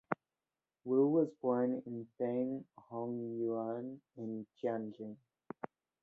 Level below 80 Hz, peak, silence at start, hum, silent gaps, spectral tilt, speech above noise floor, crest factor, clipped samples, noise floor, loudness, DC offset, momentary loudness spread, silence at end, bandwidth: -84 dBFS; -14 dBFS; 0.1 s; none; none; -9 dB/octave; over 53 dB; 24 dB; under 0.1%; under -90 dBFS; -37 LUFS; under 0.1%; 17 LU; 0.35 s; 3.9 kHz